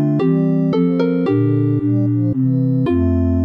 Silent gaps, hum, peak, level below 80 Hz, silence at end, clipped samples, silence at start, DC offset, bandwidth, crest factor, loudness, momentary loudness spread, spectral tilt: none; none; -6 dBFS; -36 dBFS; 0 s; under 0.1%; 0 s; under 0.1%; 5.4 kHz; 10 dB; -16 LUFS; 1 LU; -11 dB/octave